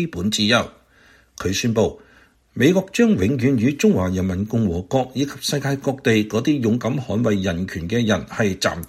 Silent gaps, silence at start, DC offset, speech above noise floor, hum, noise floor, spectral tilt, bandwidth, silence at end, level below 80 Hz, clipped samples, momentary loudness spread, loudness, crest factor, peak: none; 0 s; under 0.1%; 34 dB; none; -53 dBFS; -5.5 dB/octave; 15 kHz; 0 s; -46 dBFS; under 0.1%; 6 LU; -20 LUFS; 18 dB; -4 dBFS